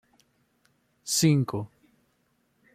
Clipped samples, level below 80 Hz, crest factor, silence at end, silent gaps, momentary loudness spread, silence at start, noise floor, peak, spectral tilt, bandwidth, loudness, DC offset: under 0.1%; -66 dBFS; 20 dB; 1.1 s; none; 21 LU; 1.05 s; -71 dBFS; -10 dBFS; -4.5 dB/octave; 16 kHz; -25 LUFS; under 0.1%